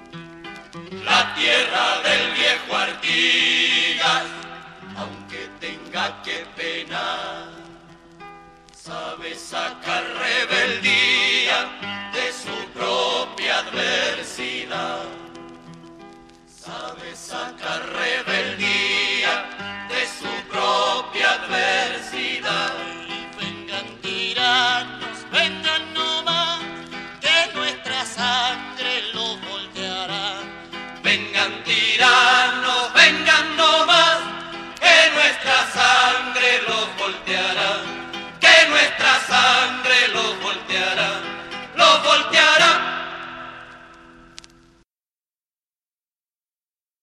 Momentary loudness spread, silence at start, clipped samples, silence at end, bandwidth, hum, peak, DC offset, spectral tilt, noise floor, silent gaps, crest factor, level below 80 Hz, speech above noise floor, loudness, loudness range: 19 LU; 0 s; under 0.1%; 3.05 s; 13 kHz; none; 0 dBFS; under 0.1%; -1 dB/octave; under -90 dBFS; none; 22 dB; -60 dBFS; over 69 dB; -18 LUFS; 14 LU